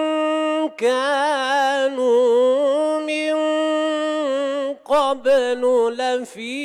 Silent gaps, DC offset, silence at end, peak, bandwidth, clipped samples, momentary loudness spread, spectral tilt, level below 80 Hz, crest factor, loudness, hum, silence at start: none; under 0.1%; 0 s; -8 dBFS; 12 kHz; under 0.1%; 6 LU; -2.5 dB/octave; -68 dBFS; 10 dB; -19 LUFS; none; 0 s